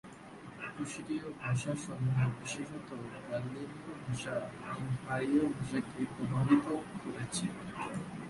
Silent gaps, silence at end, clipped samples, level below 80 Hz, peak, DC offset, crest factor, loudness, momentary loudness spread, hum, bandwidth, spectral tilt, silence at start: none; 0 s; under 0.1%; -64 dBFS; -14 dBFS; under 0.1%; 20 dB; -36 LUFS; 13 LU; none; 11.5 kHz; -6 dB/octave; 0.05 s